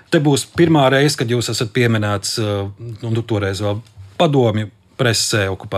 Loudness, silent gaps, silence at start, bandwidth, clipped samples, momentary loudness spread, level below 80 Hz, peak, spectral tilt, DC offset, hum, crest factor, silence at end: -17 LUFS; none; 0.1 s; 15.5 kHz; under 0.1%; 11 LU; -54 dBFS; -2 dBFS; -5 dB/octave; under 0.1%; none; 16 dB; 0 s